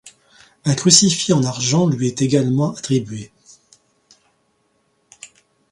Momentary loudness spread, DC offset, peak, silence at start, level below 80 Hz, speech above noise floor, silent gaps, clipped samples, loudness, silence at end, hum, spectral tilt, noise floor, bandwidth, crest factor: 11 LU; under 0.1%; 0 dBFS; 0.05 s; -56 dBFS; 48 dB; none; under 0.1%; -16 LUFS; 0.45 s; none; -4 dB/octave; -64 dBFS; 16 kHz; 20 dB